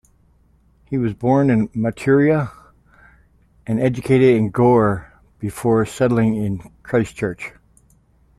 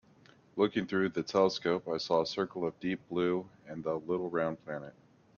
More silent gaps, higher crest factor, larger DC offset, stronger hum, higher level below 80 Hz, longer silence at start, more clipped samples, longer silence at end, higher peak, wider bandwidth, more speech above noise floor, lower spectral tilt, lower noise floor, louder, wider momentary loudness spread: neither; about the same, 16 dB vs 20 dB; neither; neither; first, -48 dBFS vs -70 dBFS; first, 0.9 s vs 0.55 s; neither; first, 0.9 s vs 0.45 s; first, -4 dBFS vs -14 dBFS; first, 13.5 kHz vs 7.2 kHz; first, 39 dB vs 29 dB; first, -8 dB/octave vs -6 dB/octave; second, -56 dBFS vs -61 dBFS; first, -18 LUFS vs -33 LUFS; about the same, 15 LU vs 13 LU